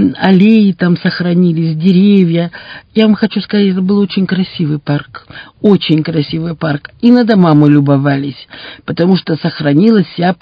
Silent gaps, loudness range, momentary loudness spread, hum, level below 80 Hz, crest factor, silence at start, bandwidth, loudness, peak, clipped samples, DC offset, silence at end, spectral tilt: none; 3 LU; 10 LU; none; -50 dBFS; 10 dB; 0 s; 5.2 kHz; -11 LUFS; 0 dBFS; 0.5%; under 0.1%; 0.05 s; -9.5 dB/octave